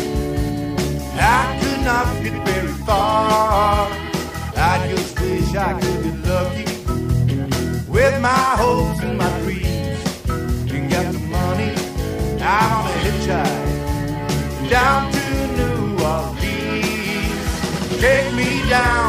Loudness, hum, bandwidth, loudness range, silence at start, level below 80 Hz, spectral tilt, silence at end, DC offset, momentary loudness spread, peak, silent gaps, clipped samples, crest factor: -19 LUFS; none; 16 kHz; 2 LU; 0 s; -28 dBFS; -5.5 dB/octave; 0 s; under 0.1%; 7 LU; -6 dBFS; none; under 0.1%; 12 dB